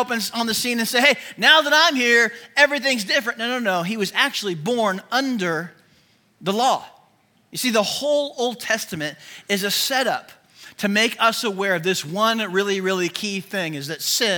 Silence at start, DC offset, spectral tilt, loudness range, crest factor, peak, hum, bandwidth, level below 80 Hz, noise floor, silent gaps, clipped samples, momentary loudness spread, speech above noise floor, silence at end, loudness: 0 s; under 0.1%; -2.5 dB/octave; 7 LU; 20 dB; 0 dBFS; none; 18 kHz; -70 dBFS; -60 dBFS; none; under 0.1%; 11 LU; 39 dB; 0 s; -20 LUFS